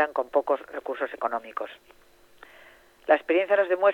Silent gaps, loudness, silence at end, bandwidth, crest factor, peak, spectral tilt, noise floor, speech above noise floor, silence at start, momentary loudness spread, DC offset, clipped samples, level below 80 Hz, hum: none; -26 LUFS; 0 s; 5.8 kHz; 20 dB; -6 dBFS; -4.5 dB/octave; -54 dBFS; 28 dB; 0 s; 14 LU; under 0.1%; under 0.1%; -68 dBFS; none